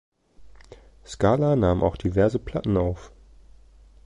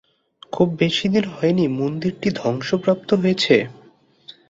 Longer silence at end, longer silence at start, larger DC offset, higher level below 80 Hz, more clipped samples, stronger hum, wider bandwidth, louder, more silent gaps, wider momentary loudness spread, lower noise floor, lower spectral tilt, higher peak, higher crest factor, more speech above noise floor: first, 1 s vs 0.2 s; about the same, 0.4 s vs 0.5 s; neither; first, -40 dBFS vs -56 dBFS; neither; neither; first, 10.5 kHz vs 7.8 kHz; second, -23 LUFS vs -20 LUFS; neither; first, 9 LU vs 6 LU; about the same, -51 dBFS vs -52 dBFS; first, -8 dB/octave vs -6 dB/octave; second, -6 dBFS vs -2 dBFS; about the same, 18 dB vs 18 dB; second, 29 dB vs 33 dB